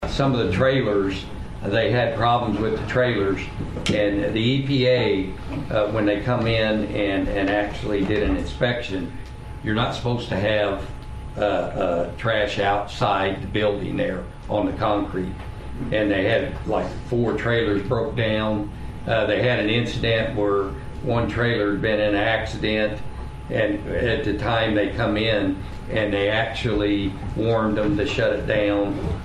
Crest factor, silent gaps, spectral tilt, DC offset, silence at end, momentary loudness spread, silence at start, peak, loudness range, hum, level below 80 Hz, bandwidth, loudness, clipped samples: 16 dB; none; -6.5 dB/octave; under 0.1%; 0 s; 9 LU; 0 s; -6 dBFS; 3 LU; none; -36 dBFS; 11.5 kHz; -22 LUFS; under 0.1%